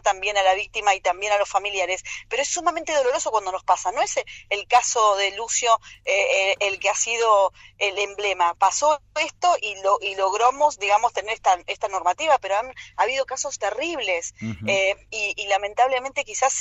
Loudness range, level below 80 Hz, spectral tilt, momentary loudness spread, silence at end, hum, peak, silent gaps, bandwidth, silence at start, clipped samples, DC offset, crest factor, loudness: 3 LU; -56 dBFS; -1 dB/octave; 7 LU; 0 s; none; -6 dBFS; none; 8.4 kHz; 0.05 s; under 0.1%; under 0.1%; 16 dB; -22 LUFS